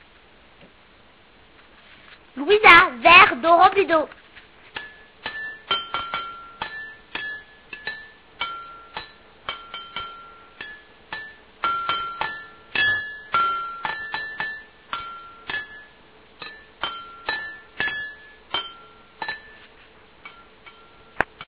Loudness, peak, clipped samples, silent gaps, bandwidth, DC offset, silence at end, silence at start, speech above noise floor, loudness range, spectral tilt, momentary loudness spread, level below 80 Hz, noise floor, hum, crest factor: -20 LUFS; 0 dBFS; under 0.1%; none; 4 kHz; 0.1%; 0.05 s; 2.35 s; 38 dB; 18 LU; 0.5 dB/octave; 24 LU; -56 dBFS; -53 dBFS; none; 24 dB